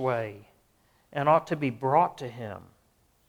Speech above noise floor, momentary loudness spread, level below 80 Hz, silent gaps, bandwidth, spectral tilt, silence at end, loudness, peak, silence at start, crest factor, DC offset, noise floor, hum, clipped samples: 39 dB; 16 LU; -68 dBFS; none; 19 kHz; -7.5 dB/octave; 0.65 s; -27 LUFS; -10 dBFS; 0 s; 20 dB; under 0.1%; -66 dBFS; none; under 0.1%